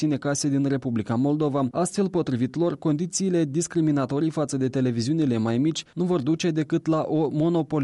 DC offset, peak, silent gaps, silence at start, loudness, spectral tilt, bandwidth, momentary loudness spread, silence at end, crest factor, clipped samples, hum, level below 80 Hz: under 0.1%; -14 dBFS; none; 0 s; -24 LUFS; -6 dB/octave; 11.5 kHz; 2 LU; 0 s; 10 dB; under 0.1%; none; -62 dBFS